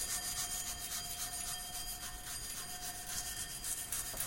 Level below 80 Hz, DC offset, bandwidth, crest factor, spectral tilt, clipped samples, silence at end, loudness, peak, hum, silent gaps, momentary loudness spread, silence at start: -54 dBFS; under 0.1%; 16.5 kHz; 22 dB; 0 dB/octave; under 0.1%; 0 s; -39 LUFS; -20 dBFS; none; none; 5 LU; 0 s